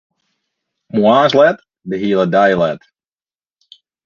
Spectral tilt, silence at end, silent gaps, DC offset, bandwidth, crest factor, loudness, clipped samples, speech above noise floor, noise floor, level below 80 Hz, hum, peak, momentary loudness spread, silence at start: -6.5 dB/octave; 1.3 s; none; under 0.1%; 7 kHz; 16 dB; -13 LUFS; under 0.1%; over 78 dB; under -90 dBFS; -56 dBFS; none; 0 dBFS; 14 LU; 0.95 s